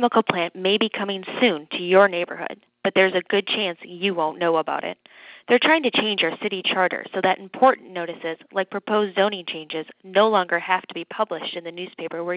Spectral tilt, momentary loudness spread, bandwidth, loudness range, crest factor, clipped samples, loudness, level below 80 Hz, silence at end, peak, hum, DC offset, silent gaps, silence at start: -8 dB/octave; 13 LU; 4 kHz; 2 LU; 20 dB; under 0.1%; -22 LUFS; -72 dBFS; 0 s; -2 dBFS; none; under 0.1%; none; 0 s